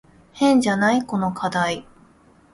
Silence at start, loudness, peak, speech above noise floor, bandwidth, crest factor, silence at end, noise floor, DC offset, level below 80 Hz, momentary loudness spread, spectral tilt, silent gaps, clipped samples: 0.35 s; -20 LUFS; -6 dBFS; 34 dB; 11.5 kHz; 16 dB; 0.7 s; -53 dBFS; under 0.1%; -56 dBFS; 8 LU; -5 dB/octave; none; under 0.1%